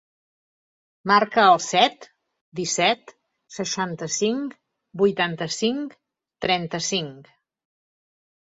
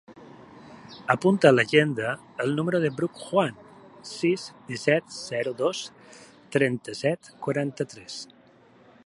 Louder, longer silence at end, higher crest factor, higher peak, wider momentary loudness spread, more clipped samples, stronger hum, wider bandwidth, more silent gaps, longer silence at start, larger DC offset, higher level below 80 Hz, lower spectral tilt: first, -22 LUFS vs -25 LUFS; first, 1.35 s vs 0.85 s; about the same, 24 dB vs 24 dB; about the same, -2 dBFS vs -2 dBFS; about the same, 18 LU vs 19 LU; neither; neither; second, 8 kHz vs 11.5 kHz; first, 2.41-2.52 s vs none; first, 1.05 s vs 0.1 s; neither; about the same, -66 dBFS vs -70 dBFS; second, -3 dB/octave vs -5.5 dB/octave